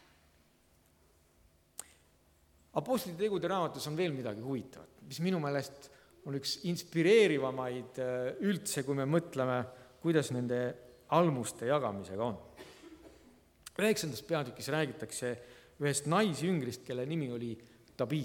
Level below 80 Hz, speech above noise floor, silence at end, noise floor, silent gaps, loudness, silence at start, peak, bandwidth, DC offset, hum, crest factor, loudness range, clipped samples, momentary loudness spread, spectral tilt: -70 dBFS; 35 dB; 0 s; -68 dBFS; none; -34 LUFS; 1.8 s; -14 dBFS; 19 kHz; under 0.1%; none; 22 dB; 6 LU; under 0.1%; 19 LU; -5 dB/octave